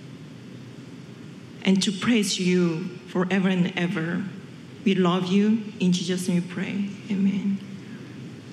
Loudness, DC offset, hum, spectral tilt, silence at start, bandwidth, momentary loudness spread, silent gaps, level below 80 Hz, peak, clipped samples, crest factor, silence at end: -24 LUFS; under 0.1%; none; -5.5 dB/octave; 0 s; 12.5 kHz; 20 LU; none; -72 dBFS; -6 dBFS; under 0.1%; 18 dB; 0 s